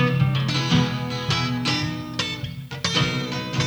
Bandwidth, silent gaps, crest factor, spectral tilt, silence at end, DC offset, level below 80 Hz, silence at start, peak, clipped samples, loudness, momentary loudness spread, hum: over 20 kHz; none; 16 dB; -5 dB/octave; 0 s; under 0.1%; -48 dBFS; 0 s; -6 dBFS; under 0.1%; -23 LUFS; 7 LU; none